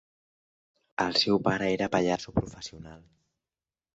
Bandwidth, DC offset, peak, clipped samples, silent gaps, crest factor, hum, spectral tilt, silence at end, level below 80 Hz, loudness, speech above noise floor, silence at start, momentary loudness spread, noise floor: 8 kHz; under 0.1%; -10 dBFS; under 0.1%; none; 20 dB; none; -5 dB/octave; 0.95 s; -54 dBFS; -27 LUFS; over 62 dB; 1 s; 18 LU; under -90 dBFS